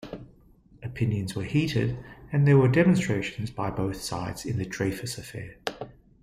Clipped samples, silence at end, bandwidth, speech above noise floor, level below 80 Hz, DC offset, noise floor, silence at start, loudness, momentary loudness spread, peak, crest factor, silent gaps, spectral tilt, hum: under 0.1%; 0.3 s; 15 kHz; 31 dB; -52 dBFS; under 0.1%; -56 dBFS; 0 s; -27 LUFS; 19 LU; -8 dBFS; 18 dB; none; -6.5 dB/octave; none